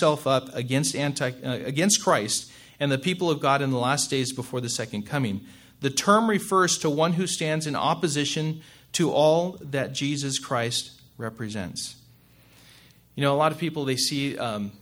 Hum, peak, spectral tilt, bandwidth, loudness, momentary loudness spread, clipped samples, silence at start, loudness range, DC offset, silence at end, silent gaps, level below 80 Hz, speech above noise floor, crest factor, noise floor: none; -4 dBFS; -4 dB/octave; 17 kHz; -25 LUFS; 11 LU; under 0.1%; 0 s; 6 LU; under 0.1%; 0.05 s; none; -64 dBFS; 30 dB; 22 dB; -55 dBFS